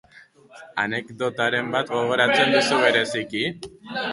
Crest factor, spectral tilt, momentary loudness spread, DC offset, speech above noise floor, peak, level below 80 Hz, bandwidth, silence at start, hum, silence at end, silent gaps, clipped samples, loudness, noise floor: 20 dB; -3.5 dB/octave; 11 LU; under 0.1%; 28 dB; -4 dBFS; -64 dBFS; 11.5 kHz; 0.55 s; none; 0 s; none; under 0.1%; -21 LUFS; -51 dBFS